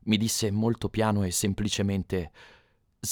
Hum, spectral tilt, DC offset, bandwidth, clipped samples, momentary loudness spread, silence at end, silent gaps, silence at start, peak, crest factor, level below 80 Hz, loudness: none; -4.5 dB/octave; under 0.1%; 20 kHz; under 0.1%; 8 LU; 0 s; none; 0.05 s; -8 dBFS; 20 dB; -50 dBFS; -27 LUFS